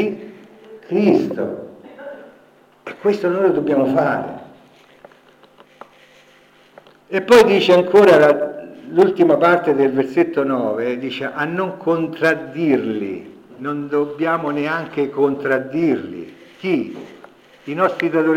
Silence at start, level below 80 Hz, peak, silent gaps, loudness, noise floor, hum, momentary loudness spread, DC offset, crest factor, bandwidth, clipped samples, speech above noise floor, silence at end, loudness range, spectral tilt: 0 s; -64 dBFS; -4 dBFS; none; -17 LUFS; -51 dBFS; none; 21 LU; under 0.1%; 16 dB; 16.5 kHz; under 0.1%; 34 dB; 0 s; 8 LU; -6.5 dB/octave